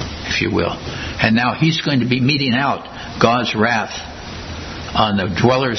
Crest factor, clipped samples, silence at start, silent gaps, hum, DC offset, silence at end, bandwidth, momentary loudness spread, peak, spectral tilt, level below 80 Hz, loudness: 18 dB; under 0.1%; 0 s; none; none; under 0.1%; 0 s; 6.4 kHz; 13 LU; 0 dBFS; -5.5 dB/octave; -40 dBFS; -17 LUFS